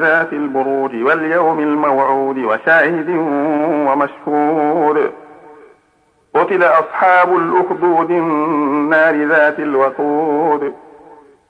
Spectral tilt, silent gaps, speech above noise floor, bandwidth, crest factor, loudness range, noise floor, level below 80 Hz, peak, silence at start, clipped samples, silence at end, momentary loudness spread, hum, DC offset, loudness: -7.5 dB/octave; none; 43 dB; 5.6 kHz; 14 dB; 3 LU; -56 dBFS; -66 dBFS; 0 dBFS; 0 s; under 0.1%; 0.35 s; 6 LU; none; under 0.1%; -14 LUFS